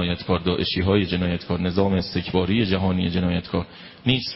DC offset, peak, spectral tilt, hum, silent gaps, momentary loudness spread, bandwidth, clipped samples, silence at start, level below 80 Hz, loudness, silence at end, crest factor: under 0.1%; -4 dBFS; -10 dB/octave; none; none; 5 LU; 5.8 kHz; under 0.1%; 0 s; -36 dBFS; -23 LUFS; 0 s; 18 dB